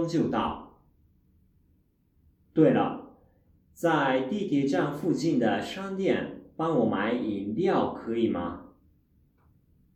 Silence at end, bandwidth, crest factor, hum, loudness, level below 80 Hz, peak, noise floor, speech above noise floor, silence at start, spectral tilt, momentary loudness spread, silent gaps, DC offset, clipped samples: 1.3 s; 13.5 kHz; 20 dB; none; -27 LUFS; -60 dBFS; -10 dBFS; -67 dBFS; 40 dB; 0 s; -7 dB/octave; 9 LU; none; under 0.1%; under 0.1%